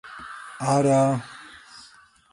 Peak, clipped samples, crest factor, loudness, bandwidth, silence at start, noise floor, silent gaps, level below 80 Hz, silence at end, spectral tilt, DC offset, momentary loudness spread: -8 dBFS; under 0.1%; 16 dB; -22 LUFS; 11.5 kHz; 0.05 s; -53 dBFS; none; -62 dBFS; 0.85 s; -6.5 dB/octave; under 0.1%; 24 LU